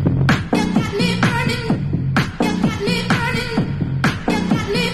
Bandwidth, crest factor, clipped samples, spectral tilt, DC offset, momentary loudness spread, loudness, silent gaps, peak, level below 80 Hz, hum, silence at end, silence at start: 13 kHz; 14 dB; under 0.1%; -6 dB/octave; under 0.1%; 4 LU; -19 LUFS; none; -4 dBFS; -36 dBFS; none; 0 s; 0 s